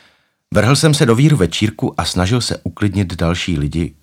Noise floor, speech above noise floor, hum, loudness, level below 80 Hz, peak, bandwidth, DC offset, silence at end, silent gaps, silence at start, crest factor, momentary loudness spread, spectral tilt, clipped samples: -55 dBFS; 40 dB; none; -15 LUFS; -34 dBFS; 0 dBFS; 16 kHz; under 0.1%; 0.15 s; none; 0.5 s; 16 dB; 8 LU; -5.5 dB/octave; under 0.1%